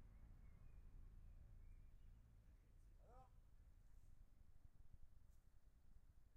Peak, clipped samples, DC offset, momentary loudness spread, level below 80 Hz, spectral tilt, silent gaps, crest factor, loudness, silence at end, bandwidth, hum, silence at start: -50 dBFS; under 0.1%; under 0.1%; 1 LU; -66 dBFS; -7 dB/octave; none; 14 dB; -69 LUFS; 0 s; 3 kHz; none; 0 s